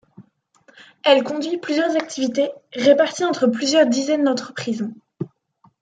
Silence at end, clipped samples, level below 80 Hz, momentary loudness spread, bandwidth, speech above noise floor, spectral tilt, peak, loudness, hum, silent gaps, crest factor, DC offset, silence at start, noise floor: 0.55 s; under 0.1%; -70 dBFS; 13 LU; 9.4 kHz; 40 dB; -4 dB/octave; -2 dBFS; -19 LUFS; none; none; 18 dB; under 0.1%; 0.2 s; -59 dBFS